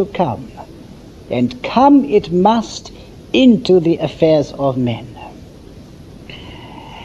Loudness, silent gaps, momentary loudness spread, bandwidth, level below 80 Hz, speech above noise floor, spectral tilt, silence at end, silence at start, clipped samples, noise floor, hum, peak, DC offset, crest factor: -14 LUFS; none; 24 LU; 8.2 kHz; -44 dBFS; 23 dB; -7 dB/octave; 0 s; 0 s; under 0.1%; -37 dBFS; none; 0 dBFS; under 0.1%; 16 dB